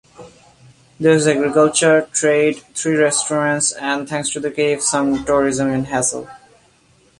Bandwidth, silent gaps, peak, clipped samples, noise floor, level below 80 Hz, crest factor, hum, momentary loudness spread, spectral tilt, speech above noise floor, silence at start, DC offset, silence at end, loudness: 11.5 kHz; none; -2 dBFS; under 0.1%; -54 dBFS; -52 dBFS; 16 dB; none; 7 LU; -3.5 dB/octave; 38 dB; 0.2 s; under 0.1%; 0.85 s; -17 LUFS